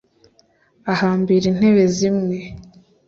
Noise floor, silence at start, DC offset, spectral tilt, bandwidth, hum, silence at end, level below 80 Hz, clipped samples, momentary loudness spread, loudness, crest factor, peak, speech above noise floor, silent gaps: -58 dBFS; 0.85 s; under 0.1%; -6.5 dB/octave; 7.6 kHz; none; 0.45 s; -52 dBFS; under 0.1%; 15 LU; -17 LUFS; 16 dB; -4 dBFS; 41 dB; none